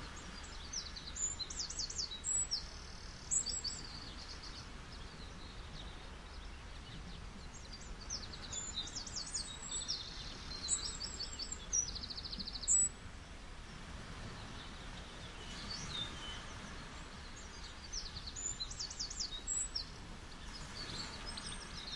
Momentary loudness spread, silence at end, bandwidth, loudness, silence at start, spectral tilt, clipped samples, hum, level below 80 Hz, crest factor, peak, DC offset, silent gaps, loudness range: 15 LU; 0 s; 11.5 kHz; -41 LUFS; 0 s; -1 dB/octave; under 0.1%; none; -52 dBFS; 24 dB; -20 dBFS; under 0.1%; none; 11 LU